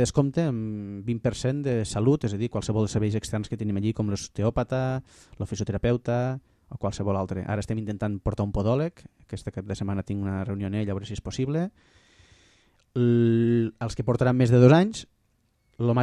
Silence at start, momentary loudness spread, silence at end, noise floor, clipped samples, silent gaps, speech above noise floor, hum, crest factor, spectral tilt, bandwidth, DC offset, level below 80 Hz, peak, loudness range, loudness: 0 s; 13 LU; 0 s; -69 dBFS; under 0.1%; none; 44 dB; none; 22 dB; -7 dB/octave; 11 kHz; under 0.1%; -48 dBFS; -4 dBFS; 8 LU; -26 LUFS